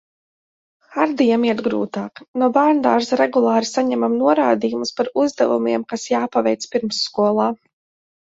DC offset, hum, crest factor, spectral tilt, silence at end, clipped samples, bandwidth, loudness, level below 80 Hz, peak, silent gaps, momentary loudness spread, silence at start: under 0.1%; none; 18 dB; -4.5 dB/octave; 0.7 s; under 0.1%; 8 kHz; -18 LUFS; -64 dBFS; -2 dBFS; 2.28-2.34 s; 7 LU; 0.9 s